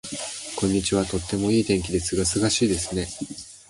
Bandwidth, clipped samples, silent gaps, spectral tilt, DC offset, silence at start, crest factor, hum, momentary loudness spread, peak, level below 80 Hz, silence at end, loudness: 11.5 kHz; under 0.1%; none; -4 dB/octave; under 0.1%; 0.05 s; 16 dB; none; 10 LU; -8 dBFS; -42 dBFS; 0.1 s; -24 LUFS